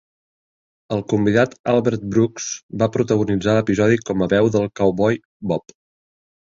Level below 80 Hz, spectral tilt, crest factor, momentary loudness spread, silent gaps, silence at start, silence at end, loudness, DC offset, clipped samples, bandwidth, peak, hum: -50 dBFS; -6 dB/octave; 16 dB; 9 LU; 1.59-1.64 s, 2.63-2.69 s, 5.25-5.40 s; 0.9 s; 0.9 s; -19 LUFS; under 0.1%; under 0.1%; 7.8 kHz; -2 dBFS; none